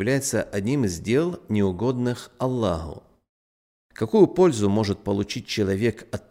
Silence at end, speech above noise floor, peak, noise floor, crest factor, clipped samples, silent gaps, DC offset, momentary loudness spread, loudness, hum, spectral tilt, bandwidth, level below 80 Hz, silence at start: 0.1 s; over 67 dB; -4 dBFS; under -90 dBFS; 20 dB; under 0.1%; 3.29-3.90 s; under 0.1%; 9 LU; -23 LUFS; none; -6 dB/octave; 16 kHz; -52 dBFS; 0 s